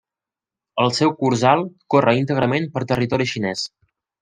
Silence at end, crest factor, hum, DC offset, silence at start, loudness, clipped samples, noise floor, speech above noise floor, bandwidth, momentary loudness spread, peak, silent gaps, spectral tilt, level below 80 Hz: 0.55 s; 18 dB; none; under 0.1%; 0.75 s; -19 LUFS; under 0.1%; -89 dBFS; 70 dB; 10 kHz; 8 LU; -2 dBFS; none; -5.5 dB/octave; -56 dBFS